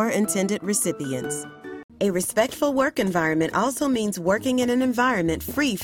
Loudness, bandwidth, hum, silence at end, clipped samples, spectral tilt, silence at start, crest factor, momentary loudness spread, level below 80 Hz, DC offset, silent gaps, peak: -23 LUFS; 18 kHz; none; 0 s; under 0.1%; -4 dB/octave; 0 s; 18 dB; 7 LU; -52 dBFS; under 0.1%; 1.84-1.89 s; -6 dBFS